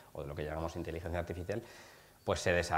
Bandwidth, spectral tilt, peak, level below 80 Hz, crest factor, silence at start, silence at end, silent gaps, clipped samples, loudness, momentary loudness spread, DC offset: 16 kHz; -5 dB/octave; -16 dBFS; -52 dBFS; 22 dB; 0 s; 0 s; none; under 0.1%; -38 LUFS; 18 LU; under 0.1%